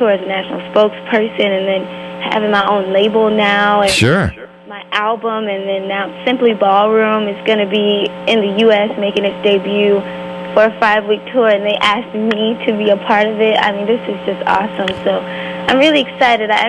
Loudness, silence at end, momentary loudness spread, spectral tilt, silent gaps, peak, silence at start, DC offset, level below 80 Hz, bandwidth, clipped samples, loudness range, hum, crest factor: -14 LUFS; 0 s; 8 LU; -5 dB/octave; none; 0 dBFS; 0 s; under 0.1%; -44 dBFS; 12.5 kHz; under 0.1%; 2 LU; none; 14 dB